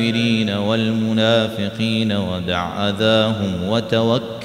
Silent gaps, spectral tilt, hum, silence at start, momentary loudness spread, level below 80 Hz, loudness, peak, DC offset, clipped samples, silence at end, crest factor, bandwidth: none; -6 dB/octave; none; 0 s; 6 LU; -50 dBFS; -18 LUFS; -2 dBFS; under 0.1%; under 0.1%; 0 s; 16 dB; 13 kHz